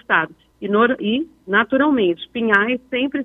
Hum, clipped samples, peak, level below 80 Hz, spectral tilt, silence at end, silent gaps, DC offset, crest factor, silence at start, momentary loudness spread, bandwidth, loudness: none; under 0.1%; 0 dBFS; -58 dBFS; -7 dB/octave; 0 s; none; under 0.1%; 18 dB; 0.1 s; 7 LU; 4 kHz; -18 LUFS